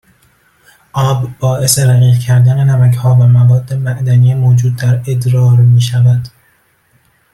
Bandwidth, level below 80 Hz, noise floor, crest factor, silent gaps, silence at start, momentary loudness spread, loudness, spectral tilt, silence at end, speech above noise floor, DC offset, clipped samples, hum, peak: 13.5 kHz; -46 dBFS; -53 dBFS; 10 dB; none; 0.95 s; 8 LU; -10 LUFS; -6 dB/octave; 1.05 s; 45 dB; under 0.1%; under 0.1%; none; 0 dBFS